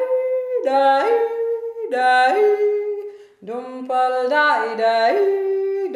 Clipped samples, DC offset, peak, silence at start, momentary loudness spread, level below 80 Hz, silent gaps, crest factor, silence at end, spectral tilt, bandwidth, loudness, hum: under 0.1%; under 0.1%; -6 dBFS; 0 s; 13 LU; -78 dBFS; none; 12 dB; 0 s; -3 dB/octave; 11 kHz; -18 LUFS; none